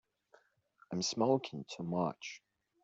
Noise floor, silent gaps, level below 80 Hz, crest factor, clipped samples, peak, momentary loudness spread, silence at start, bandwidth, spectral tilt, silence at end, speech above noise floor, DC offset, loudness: -69 dBFS; none; -78 dBFS; 22 dB; under 0.1%; -18 dBFS; 15 LU; 0.9 s; 8 kHz; -5 dB/octave; 0.45 s; 34 dB; under 0.1%; -36 LUFS